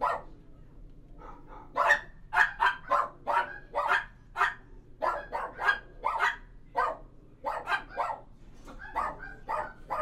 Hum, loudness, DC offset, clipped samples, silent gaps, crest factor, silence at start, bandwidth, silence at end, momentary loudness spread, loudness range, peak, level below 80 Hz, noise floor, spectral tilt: none; -30 LUFS; under 0.1%; under 0.1%; none; 24 dB; 0 s; 15.5 kHz; 0 s; 18 LU; 7 LU; -10 dBFS; -52 dBFS; -50 dBFS; -3 dB/octave